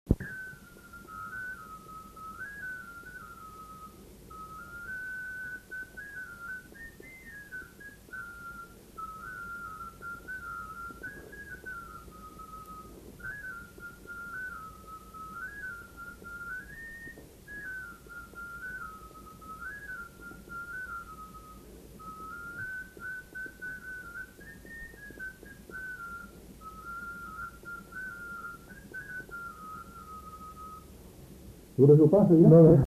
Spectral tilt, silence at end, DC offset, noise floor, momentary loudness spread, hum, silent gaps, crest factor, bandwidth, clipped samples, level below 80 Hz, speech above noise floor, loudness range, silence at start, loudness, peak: -8.5 dB/octave; 0 s; under 0.1%; -51 dBFS; 9 LU; none; none; 24 dB; 14 kHz; under 0.1%; -54 dBFS; 33 dB; 2 LU; 0.05 s; -32 LUFS; -8 dBFS